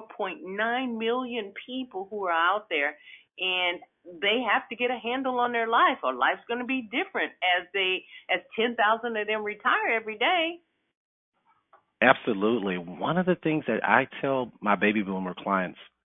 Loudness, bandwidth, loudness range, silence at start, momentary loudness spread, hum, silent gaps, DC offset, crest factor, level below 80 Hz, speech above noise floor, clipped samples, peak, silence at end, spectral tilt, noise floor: -27 LUFS; 3.9 kHz; 3 LU; 0 s; 9 LU; none; 10.97-11.32 s; under 0.1%; 26 dB; -72 dBFS; 36 dB; under 0.1%; -2 dBFS; 0.2 s; -7.5 dB/octave; -63 dBFS